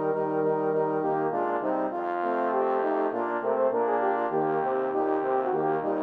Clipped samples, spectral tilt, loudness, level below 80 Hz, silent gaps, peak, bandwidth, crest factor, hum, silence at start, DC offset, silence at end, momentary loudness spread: under 0.1%; -9 dB/octave; -27 LUFS; -76 dBFS; none; -14 dBFS; 4.6 kHz; 12 dB; none; 0 s; under 0.1%; 0 s; 2 LU